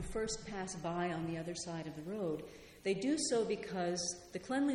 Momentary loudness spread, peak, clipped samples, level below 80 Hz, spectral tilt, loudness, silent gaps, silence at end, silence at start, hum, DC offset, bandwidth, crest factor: 9 LU; -22 dBFS; under 0.1%; -58 dBFS; -4 dB/octave; -39 LUFS; none; 0 s; 0 s; none; under 0.1%; 16 kHz; 16 dB